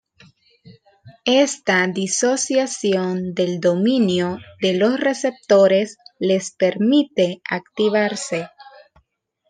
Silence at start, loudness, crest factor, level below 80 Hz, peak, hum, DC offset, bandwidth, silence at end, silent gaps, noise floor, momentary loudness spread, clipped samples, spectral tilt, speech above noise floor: 0.65 s; -19 LUFS; 18 dB; -68 dBFS; -2 dBFS; none; under 0.1%; 10 kHz; 0.85 s; none; -67 dBFS; 9 LU; under 0.1%; -4 dB/octave; 48 dB